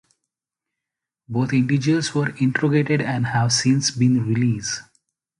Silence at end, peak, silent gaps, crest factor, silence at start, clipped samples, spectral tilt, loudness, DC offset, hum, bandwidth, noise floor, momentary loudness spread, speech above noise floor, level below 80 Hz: 0.6 s; -4 dBFS; none; 16 dB; 1.3 s; under 0.1%; -5 dB/octave; -20 LUFS; under 0.1%; none; 11.5 kHz; -86 dBFS; 7 LU; 66 dB; -56 dBFS